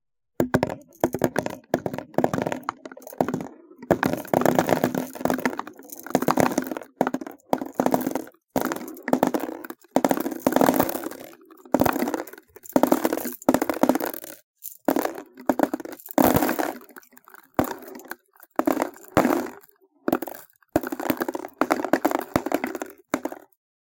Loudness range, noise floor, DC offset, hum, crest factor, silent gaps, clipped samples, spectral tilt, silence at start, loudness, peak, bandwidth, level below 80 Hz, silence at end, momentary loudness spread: 3 LU; -56 dBFS; under 0.1%; none; 24 dB; 14.43-14.54 s; under 0.1%; -5.5 dB/octave; 0.4 s; -25 LUFS; 0 dBFS; 17.5 kHz; -54 dBFS; 0.6 s; 15 LU